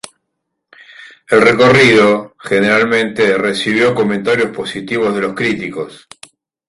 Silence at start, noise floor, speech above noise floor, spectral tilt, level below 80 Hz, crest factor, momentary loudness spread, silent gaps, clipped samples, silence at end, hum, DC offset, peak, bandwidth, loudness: 1 s; -73 dBFS; 61 dB; -5 dB/octave; -50 dBFS; 14 dB; 12 LU; none; under 0.1%; 0.75 s; none; under 0.1%; 0 dBFS; 11.5 kHz; -12 LUFS